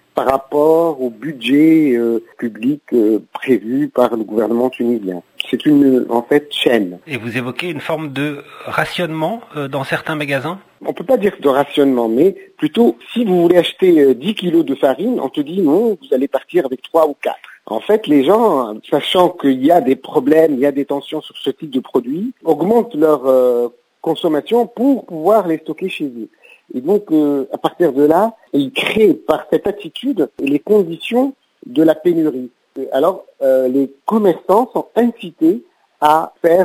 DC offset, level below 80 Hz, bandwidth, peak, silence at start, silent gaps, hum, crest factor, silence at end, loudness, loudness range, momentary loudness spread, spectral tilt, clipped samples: under 0.1%; -60 dBFS; 16 kHz; 0 dBFS; 0.15 s; none; none; 16 dB; 0 s; -15 LUFS; 4 LU; 11 LU; -6.5 dB/octave; under 0.1%